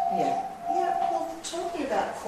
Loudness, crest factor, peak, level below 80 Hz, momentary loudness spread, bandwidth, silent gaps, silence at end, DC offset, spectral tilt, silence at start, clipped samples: -29 LUFS; 14 dB; -14 dBFS; -60 dBFS; 6 LU; 13 kHz; none; 0 s; under 0.1%; -4 dB/octave; 0 s; under 0.1%